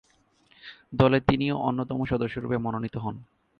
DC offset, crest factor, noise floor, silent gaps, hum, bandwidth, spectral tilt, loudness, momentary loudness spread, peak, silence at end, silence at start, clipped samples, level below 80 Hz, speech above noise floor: under 0.1%; 22 dB; -63 dBFS; none; none; 6.2 kHz; -9 dB/octave; -27 LUFS; 23 LU; -6 dBFS; 0.35 s; 0.65 s; under 0.1%; -48 dBFS; 38 dB